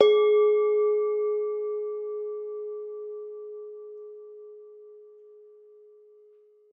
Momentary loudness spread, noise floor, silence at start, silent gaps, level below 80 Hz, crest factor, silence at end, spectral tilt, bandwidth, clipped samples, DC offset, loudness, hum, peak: 25 LU; -57 dBFS; 0 s; none; -88 dBFS; 24 dB; 1.65 s; -3.5 dB/octave; 4.7 kHz; under 0.1%; under 0.1%; -26 LUFS; none; -4 dBFS